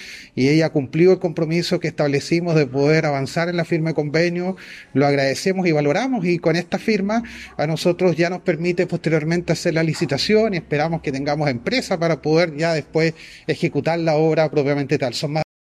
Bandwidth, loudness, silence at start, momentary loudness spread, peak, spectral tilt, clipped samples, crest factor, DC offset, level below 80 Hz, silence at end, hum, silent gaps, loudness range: 14 kHz; -20 LUFS; 0 s; 6 LU; -4 dBFS; -6 dB/octave; under 0.1%; 14 dB; under 0.1%; -54 dBFS; 0.3 s; none; none; 2 LU